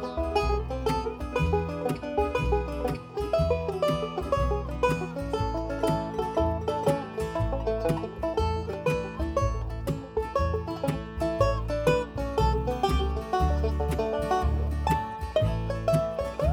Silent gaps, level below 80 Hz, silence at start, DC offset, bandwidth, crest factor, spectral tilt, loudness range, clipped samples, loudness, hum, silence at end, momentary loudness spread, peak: none; -34 dBFS; 0 s; under 0.1%; 16.5 kHz; 16 dB; -7 dB/octave; 2 LU; under 0.1%; -28 LUFS; none; 0 s; 5 LU; -10 dBFS